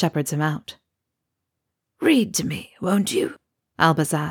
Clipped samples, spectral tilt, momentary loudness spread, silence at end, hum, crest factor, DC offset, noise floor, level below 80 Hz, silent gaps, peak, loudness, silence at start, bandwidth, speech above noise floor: under 0.1%; -5 dB/octave; 11 LU; 0 s; none; 20 dB; under 0.1%; -81 dBFS; -62 dBFS; none; -4 dBFS; -22 LUFS; 0 s; 19.5 kHz; 59 dB